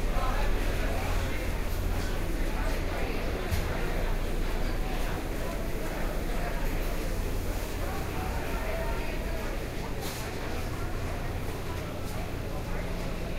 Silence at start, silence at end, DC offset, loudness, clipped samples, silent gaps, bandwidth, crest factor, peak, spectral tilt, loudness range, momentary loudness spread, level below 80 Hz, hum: 0 s; 0 s; under 0.1%; -34 LUFS; under 0.1%; none; 16 kHz; 14 dB; -16 dBFS; -5.5 dB/octave; 3 LU; 4 LU; -32 dBFS; none